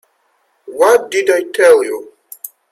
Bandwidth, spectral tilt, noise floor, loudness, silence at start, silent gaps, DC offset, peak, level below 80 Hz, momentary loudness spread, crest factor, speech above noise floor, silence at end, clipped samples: 16 kHz; -2 dB/octave; -61 dBFS; -12 LUFS; 0.65 s; none; under 0.1%; 0 dBFS; -66 dBFS; 21 LU; 14 dB; 49 dB; 0.25 s; under 0.1%